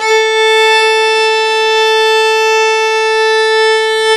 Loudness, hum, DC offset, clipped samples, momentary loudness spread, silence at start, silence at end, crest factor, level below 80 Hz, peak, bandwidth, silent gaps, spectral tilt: -9 LUFS; none; under 0.1%; under 0.1%; 3 LU; 0 s; 0 s; 10 dB; -56 dBFS; 0 dBFS; 12 kHz; none; 2 dB/octave